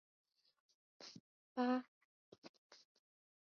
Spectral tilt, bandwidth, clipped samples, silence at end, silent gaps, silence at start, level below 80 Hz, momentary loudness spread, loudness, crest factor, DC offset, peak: -3 dB/octave; 6.8 kHz; under 0.1%; 0.65 s; 1.20-1.56 s, 1.88-2.32 s, 2.38-2.42 s, 2.49-2.70 s; 1 s; under -90 dBFS; 24 LU; -42 LUFS; 20 dB; under 0.1%; -28 dBFS